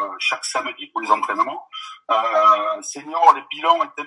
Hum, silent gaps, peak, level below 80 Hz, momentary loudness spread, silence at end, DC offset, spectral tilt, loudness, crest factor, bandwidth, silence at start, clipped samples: none; none; 0 dBFS; -88 dBFS; 13 LU; 0 s; under 0.1%; -0.5 dB/octave; -19 LUFS; 20 dB; 11.5 kHz; 0 s; under 0.1%